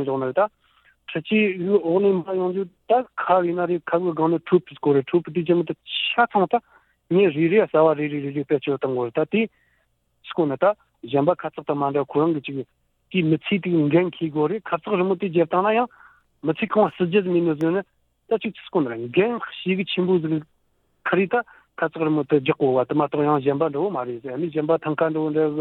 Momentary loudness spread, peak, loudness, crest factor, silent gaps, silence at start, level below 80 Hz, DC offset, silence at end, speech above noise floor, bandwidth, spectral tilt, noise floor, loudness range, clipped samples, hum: 8 LU; -6 dBFS; -22 LUFS; 16 dB; none; 0 s; -66 dBFS; under 0.1%; 0 s; 46 dB; 4.2 kHz; -9.5 dB/octave; -67 dBFS; 3 LU; under 0.1%; none